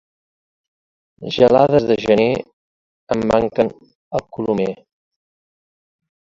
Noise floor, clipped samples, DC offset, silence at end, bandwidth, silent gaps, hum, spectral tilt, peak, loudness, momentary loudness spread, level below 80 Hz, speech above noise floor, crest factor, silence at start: under -90 dBFS; under 0.1%; under 0.1%; 1.55 s; 7.8 kHz; 2.53-3.07 s, 3.95-4.11 s; none; -7 dB/octave; 0 dBFS; -17 LUFS; 13 LU; -50 dBFS; over 74 dB; 20 dB; 1.2 s